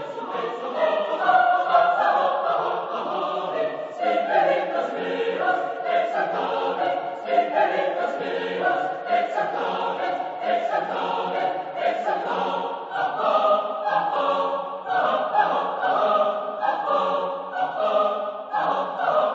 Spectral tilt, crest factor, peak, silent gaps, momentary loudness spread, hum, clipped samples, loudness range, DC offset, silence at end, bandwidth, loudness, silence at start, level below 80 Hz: -5 dB/octave; 18 dB; -6 dBFS; none; 7 LU; none; under 0.1%; 3 LU; under 0.1%; 0 s; 7.8 kHz; -23 LUFS; 0 s; -84 dBFS